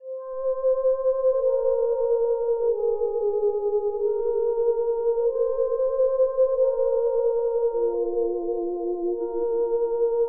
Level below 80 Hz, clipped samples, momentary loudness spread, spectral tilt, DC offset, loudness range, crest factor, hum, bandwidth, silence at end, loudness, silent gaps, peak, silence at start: -52 dBFS; under 0.1%; 5 LU; -3.5 dB/octave; 0.2%; 2 LU; 10 dB; none; 1.7 kHz; 0 s; -24 LUFS; none; -12 dBFS; 0 s